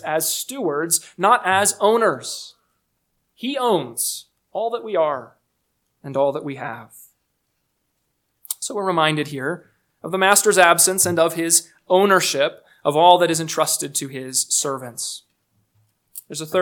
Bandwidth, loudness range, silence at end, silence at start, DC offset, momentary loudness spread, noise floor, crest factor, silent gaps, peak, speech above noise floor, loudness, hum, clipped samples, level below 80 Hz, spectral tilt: 19 kHz; 10 LU; 0 s; 0.05 s; under 0.1%; 17 LU; -72 dBFS; 20 dB; none; 0 dBFS; 53 dB; -19 LUFS; none; under 0.1%; -72 dBFS; -2.5 dB/octave